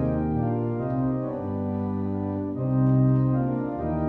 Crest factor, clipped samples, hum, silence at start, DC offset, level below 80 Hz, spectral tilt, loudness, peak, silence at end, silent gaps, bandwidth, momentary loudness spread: 14 dB; under 0.1%; none; 0 s; under 0.1%; -44 dBFS; -13 dB/octave; -26 LUFS; -12 dBFS; 0 s; none; 2.8 kHz; 8 LU